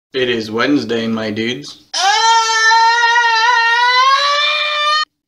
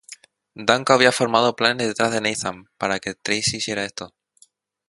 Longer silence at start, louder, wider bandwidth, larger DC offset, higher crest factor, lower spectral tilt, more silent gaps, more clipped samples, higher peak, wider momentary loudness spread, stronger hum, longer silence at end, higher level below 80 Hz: about the same, 0.15 s vs 0.1 s; first, -12 LUFS vs -20 LUFS; first, 13.5 kHz vs 11.5 kHz; neither; second, 12 dB vs 22 dB; second, -1.5 dB/octave vs -3 dB/octave; neither; neither; about the same, -2 dBFS vs 0 dBFS; second, 9 LU vs 13 LU; neither; second, 0.25 s vs 0.8 s; about the same, -60 dBFS vs -60 dBFS